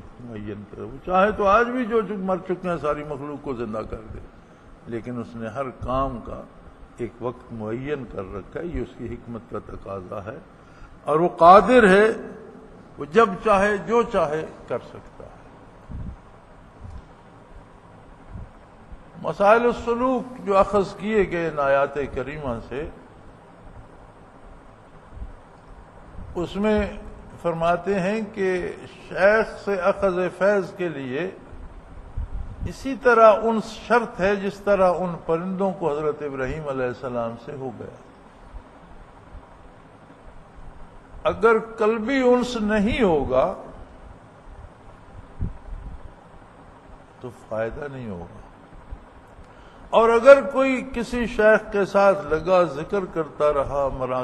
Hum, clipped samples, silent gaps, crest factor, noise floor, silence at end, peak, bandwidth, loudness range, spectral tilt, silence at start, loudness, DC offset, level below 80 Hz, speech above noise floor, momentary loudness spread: none; under 0.1%; none; 22 dB; -47 dBFS; 0 s; 0 dBFS; 10.5 kHz; 17 LU; -6.5 dB/octave; 0.05 s; -21 LUFS; under 0.1%; -42 dBFS; 26 dB; 21 LU